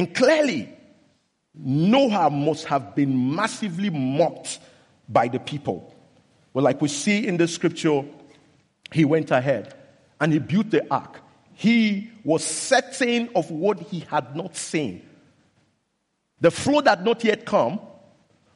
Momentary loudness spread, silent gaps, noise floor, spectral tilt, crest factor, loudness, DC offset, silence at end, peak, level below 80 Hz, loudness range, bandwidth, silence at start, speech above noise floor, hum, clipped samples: 12 LU; none; -74 dBFS; -5 dB/octave; 18 dB; -22 LUFS; under 0.1%; 0.65 s; -6 dBFS; -66 dBFS; 3 LU; 11.5 kHz; 0 s; 52 dB; none; under 0.1%